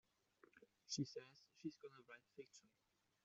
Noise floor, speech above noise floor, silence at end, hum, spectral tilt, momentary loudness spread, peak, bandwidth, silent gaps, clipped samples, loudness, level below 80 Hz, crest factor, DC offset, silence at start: -76 dBFS; 22 dB; 0.6 s; none; -5 dB/octave; 16 LU; -34 dBFS; 7.6 kHz; none; under 0.1%; -53 LUFS; under -90 dBFS; 22 dB; under 0.1%; 0.55 s